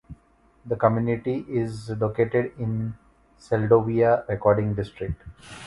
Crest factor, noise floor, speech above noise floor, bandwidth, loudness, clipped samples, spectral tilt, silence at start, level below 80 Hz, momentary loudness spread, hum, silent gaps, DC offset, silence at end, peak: 20 dB; -59 dBFS; 36 dB; 11.5 kHz; -24 LUFS; under 0.1%; -8.5 dB/octave; 0.1 s; -48 dBFS; 13 LU; none; none; under 0.1%; 0 s; -4 dBFS